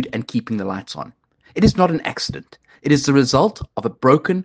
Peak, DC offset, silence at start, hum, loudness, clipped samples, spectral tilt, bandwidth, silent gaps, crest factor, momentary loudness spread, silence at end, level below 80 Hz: 0 dBFS; under 0.1%; 0 s; none; -18 LUFS; under 0.1%; -6 dB/octave; 9.8 kHz; none; 18 dB; 16 LU; 0 s; -42 dBFS